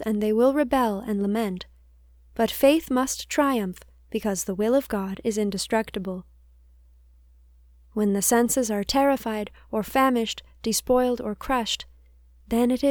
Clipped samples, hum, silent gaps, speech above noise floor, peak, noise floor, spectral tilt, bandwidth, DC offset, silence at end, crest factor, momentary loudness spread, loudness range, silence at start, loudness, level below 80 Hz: under 0.1%; none; none; 31 dB; -6 dBFS; -54 dBFS; -4 dB/octave; over 20 kHz; under 0.1%; 0 s; 18 dB; 12 LU; 4 LU; 0 s; -24 LUFS; -50 dBFS